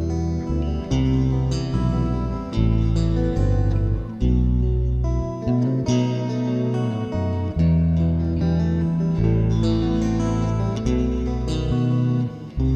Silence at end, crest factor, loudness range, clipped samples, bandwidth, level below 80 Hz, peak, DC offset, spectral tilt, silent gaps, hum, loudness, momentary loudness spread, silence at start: 0 s; 12 dB; 1 LU; under 0.1%; 8.6 kHz; -26 dBFS; -8 dBFS; under 0.1%; -8.5 dB/octave; none; none; -22 LUFS; 5 LU; 0 s